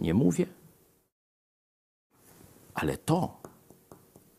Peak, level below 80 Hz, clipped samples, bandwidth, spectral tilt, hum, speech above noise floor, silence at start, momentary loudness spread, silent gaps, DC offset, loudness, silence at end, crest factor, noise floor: -12 dBFS; -56 dBFS; under 0.1%; 15 kHz; -6.5 dB/octave; none; 34 dB; 0 s; 20 LU; 1.12-2.10 s; under 0.1%; -30 LUFS; 0.45 s; 22 dB; -61 dBFS